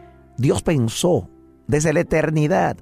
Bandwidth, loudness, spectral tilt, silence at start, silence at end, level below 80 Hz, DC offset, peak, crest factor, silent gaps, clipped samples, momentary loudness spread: 15 kHz; -20 LUFS; -6 dB/octave; 0.4 s; 0.05 s; -42 dBFS; under 0.1%; -6 dBFS; 14 dB; none; under 0.1%; 5 LU